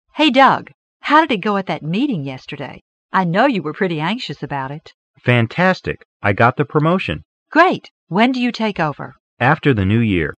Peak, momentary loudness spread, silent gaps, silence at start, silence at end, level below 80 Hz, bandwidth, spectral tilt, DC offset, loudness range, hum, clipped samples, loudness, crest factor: 0 dBFS; 15 LU; 0.74-1.00 s, 2.81-3.09 s, 4.94-5.14 s, 6.05-6.20 s, 7.25-7.46 s, 7.91-8.07 s, 9.20-9.37 s; 0.15 s; 0.05 s; -48 dBFS; 9 kHz; -7 dB/octave; under 0.1%; 3 LU; none; under 0.1%; -17 LUFS; 18 dB